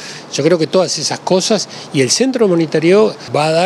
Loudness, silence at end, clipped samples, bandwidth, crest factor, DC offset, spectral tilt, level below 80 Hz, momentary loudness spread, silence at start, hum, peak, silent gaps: -14 LUFS; 0 s; under 0.1%; 13.5 kHz; 14 dB; under 0.1%; -4 dB/octave; -66 dBFS; 6 LU; 0 s; none; 0 dBFS; none